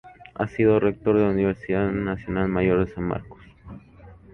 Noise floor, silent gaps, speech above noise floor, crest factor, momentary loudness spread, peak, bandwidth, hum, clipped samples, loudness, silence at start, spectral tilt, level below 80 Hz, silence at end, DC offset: -47 dBFS; none; 25 dB; 16 dB; 12 LU; -8 dBFS; 6.2 kHz; none; under 0.1%; -23 LUFS; 0.05 s; -10 dB/octave; -44 dBFS; 0.2 s; under 0.1%